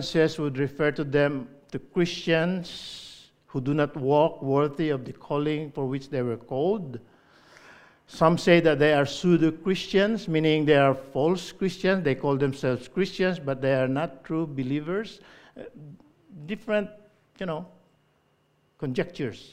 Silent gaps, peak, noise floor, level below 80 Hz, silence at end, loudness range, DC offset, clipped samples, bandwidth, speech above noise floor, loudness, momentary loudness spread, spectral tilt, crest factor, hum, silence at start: none; -4 dBFS; -67 dBFS; -56 dBFS; 0.05 s; 11 LU; under 0.1%; under 0.1%; 14 kHz; 42 dB; -25 LUFS; 16 LU; -6.5 dB/octave; 22 dB; none; 0 s